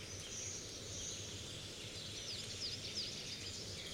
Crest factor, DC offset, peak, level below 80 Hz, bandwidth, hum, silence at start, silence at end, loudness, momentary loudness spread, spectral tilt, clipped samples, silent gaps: 16 dB; under 0.1%; -32 dBFS; -64 dBFS; 16 kHz; none; 0 s; 0 s; -44 LUFS; 5 LU; -2 dB/octave; under 0.1%; none